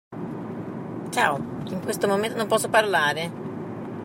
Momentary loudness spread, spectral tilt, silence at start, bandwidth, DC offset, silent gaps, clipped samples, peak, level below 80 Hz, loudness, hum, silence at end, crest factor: 14 LU; -4 dB/octave; 0.1 s; 16.5 kHz; under 0.1%; none; under 0.1%; -6 dBFS; -64 dBFS; -25 LUFS; none; 0 s; 20 dB